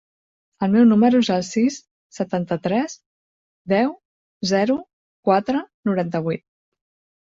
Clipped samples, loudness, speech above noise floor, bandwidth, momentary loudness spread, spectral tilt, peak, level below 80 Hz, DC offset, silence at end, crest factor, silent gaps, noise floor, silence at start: under 0.1%; -21 LUFS; over 71 dB; 7.8 kHz; 13 LU; -6 dB/octave; -4 dBFS; -62 dBFS; under 0.1%; 0.85 s; 18 dB; 1.91-2.10 s, 3.06-3.65 s, 4.05-4.40 s, 4.93-5.23 s, 5.74-5.83 s; under -90 dBFS; 0.6 s